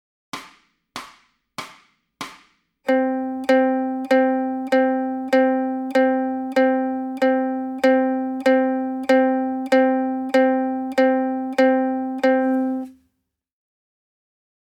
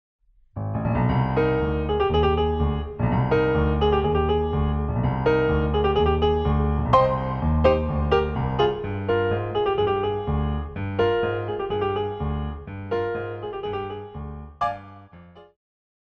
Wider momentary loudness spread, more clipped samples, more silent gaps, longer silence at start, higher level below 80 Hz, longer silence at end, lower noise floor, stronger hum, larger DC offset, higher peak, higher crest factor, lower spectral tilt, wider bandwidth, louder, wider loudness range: first, 18 LU vs 10 LU; neither; neither; second, 0.35 s vs 0.55 s; second, -68 dBFS vs -32 dBFS; first, 1.75 s vs 0.6 s; first, -75 dBFS vs -47 dBFS; neither; neither; about the same, -6 dBFS vs -4 dBFS; about the same, 16 dB vs 18 dB; second, -4.5 dB/octave vs -9 dB/octave; first, 11.5 kHz vs 6 kHz; first, -20 LUFS vs -23 LUFS; second, 4 LU vs 7 LU